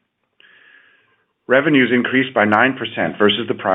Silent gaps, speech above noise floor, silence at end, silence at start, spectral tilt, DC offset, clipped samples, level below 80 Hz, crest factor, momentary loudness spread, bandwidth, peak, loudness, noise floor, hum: none; 46 dB; 0 s; 1.5 s; -7.5 dB/octave; under 0.1%; under 0.1%; -68 dBFS; 18 dB; 6 LU; 4 kHz; 0 dBFS; -16 LUFS; -62 dBFS; none